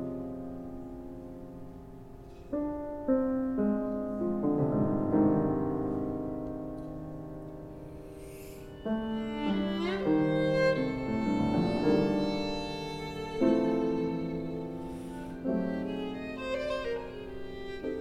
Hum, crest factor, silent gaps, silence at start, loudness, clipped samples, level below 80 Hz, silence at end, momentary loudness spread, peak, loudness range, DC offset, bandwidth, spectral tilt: none; 18 dB; none; 0 s; -32 LUFS; under 0.1%; -52 dBFS; 0 s; 18 LU; -14 dBFS; 8 LU; under 0.1%; 13.5 kHz; -7.5 dB/octave